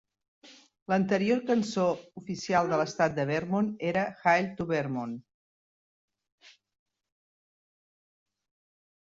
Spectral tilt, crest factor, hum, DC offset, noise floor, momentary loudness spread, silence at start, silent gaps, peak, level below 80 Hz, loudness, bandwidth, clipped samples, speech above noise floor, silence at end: -6 dB/octave; 20 dB; none; under 0.1%; under -90 dBFS; 12 LU; 0.45 s; 0.82-0.86 s, 5.34-6.08 s, 6.32-6.38 s; -12 dBFS; -68 dBFS; -29 LUFS; 7.8 kHz; under 0.1%; over 62 dB; 2.6 s